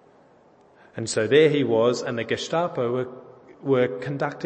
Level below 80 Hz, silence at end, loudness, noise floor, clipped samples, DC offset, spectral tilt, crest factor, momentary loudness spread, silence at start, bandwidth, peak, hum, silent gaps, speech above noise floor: -68 dBFS; 0 s; -23 LUFS; -55 dBFS; under 0.1%; under 0.1%; -5 dB/octave; 18 dB; 15 LU; 0.95 s; 8.8 kHz; -6 dBFS; none; none; 33 dB